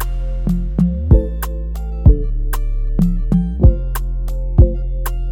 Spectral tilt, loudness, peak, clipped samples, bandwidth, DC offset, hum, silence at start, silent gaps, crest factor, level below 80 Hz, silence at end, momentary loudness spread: -8.5 dB/octave; -18 LUFS; 0 dBFS; under 0.1%; 17.5 kHz; under 0.1%; none; 0 s; none; 14 dB; -16 dBFS; 0 s; 10 LU